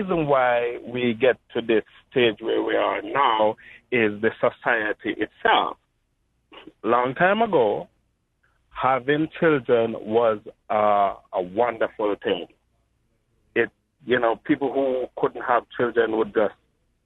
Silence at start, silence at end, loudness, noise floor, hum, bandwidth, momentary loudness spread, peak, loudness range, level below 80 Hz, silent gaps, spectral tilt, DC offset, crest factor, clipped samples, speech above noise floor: 0 s; 0.55 s; -23 LUFS; -70 dBFS; none; 4.1 kHz; 8 LU; -6 dBFS; 3 LU; -60 dBFS; none; -8 dB/octave; under 0.1%; 18 dB; under 0.1%; 48 dB